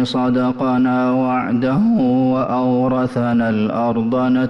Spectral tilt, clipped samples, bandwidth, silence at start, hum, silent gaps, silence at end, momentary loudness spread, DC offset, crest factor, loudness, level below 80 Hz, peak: -8.5 dB/octave; under 0.1%; 6.2 kHz; 0 s; none; none; 0 s; 3 LU; under 0.1%; 8 dB; -17 LUFS; -50 dBFS; -8 dBFS